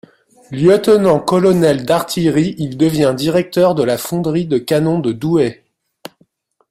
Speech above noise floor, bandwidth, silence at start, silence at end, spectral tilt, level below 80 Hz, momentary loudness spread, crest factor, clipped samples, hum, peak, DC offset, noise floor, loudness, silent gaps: 43 dB; 16 kHz; 0.5 s; 1.2 s; -6.5 dB/octave; -50 dBFS; 6 LU; 14 dB; under 0.1%; none; 0 dBFS; under 0.1%; -57 dBFS; -14 LUFS; none